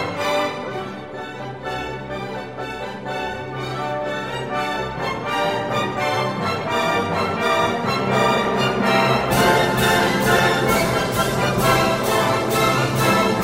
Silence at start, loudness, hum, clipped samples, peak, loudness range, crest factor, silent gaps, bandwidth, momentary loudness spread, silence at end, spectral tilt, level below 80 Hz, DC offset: 0 s; -20 LUFS; none; under 0.1%; -2 dBFS; 10 LU; 18 dB; none; 16.5 kHz; 12 LU; 0 s; -4.5 dB/octave; -44 dBFS; 0.3%